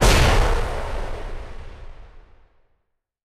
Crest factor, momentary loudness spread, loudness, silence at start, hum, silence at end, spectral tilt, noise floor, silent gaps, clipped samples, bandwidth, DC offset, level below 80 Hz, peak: 16 dB; 25 LU; -22 LUFS; 0 s; none; 1.05 s; -4 dB/octave; -72 dBFS; none; under 0.1%; 15 kHz; under 0.1%; -24 dBFS; -6 dBFS